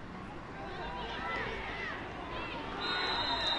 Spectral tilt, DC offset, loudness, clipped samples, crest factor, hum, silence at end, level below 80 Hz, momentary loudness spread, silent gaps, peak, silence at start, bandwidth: -4 dB/octave; under 0.1%; -37 LUFS; under 0.1%; 16 dB; none; 0 s; -52 dBFS; 12 LU; none; -22 dBFS; 0 s; 11.5 kHz